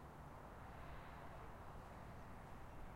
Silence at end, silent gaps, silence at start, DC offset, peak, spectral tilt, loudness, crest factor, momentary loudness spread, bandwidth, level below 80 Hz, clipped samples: 0 s; none; 0 s; under 0.1%; -42 dBFS; -6.5 dB/octave; -57 LUFS; 12 dB; 2 LU; 16 kHz; -60 dBFS; under 0.1%